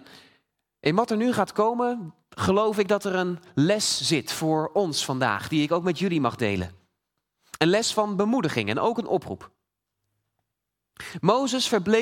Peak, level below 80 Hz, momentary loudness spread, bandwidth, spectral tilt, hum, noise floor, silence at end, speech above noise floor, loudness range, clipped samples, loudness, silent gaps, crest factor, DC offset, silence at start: -4 dBFS; -64 dBFS; 7 LU; 17.5 kHz; -4.5 dB/octave; none; -83 dBFS; 0 s; 59 dB; 4 LU; under 0.1%; -24 LUFS; none; 22 dB; under 0.1%; 0.85 s